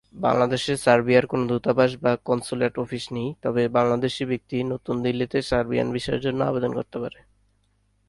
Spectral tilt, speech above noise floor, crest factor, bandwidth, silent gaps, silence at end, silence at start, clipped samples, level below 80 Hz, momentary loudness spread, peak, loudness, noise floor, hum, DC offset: -6 dB/octave; 43 dB; 20 dB; 11.5 kHz; none; 1 s; 0.15 s; under 0.1%; -52 dBFS; 9 LU; -4 dBFS; -24 LUFS; -66 dBFS; 50 Hz at -60 dBFS; under 0.1%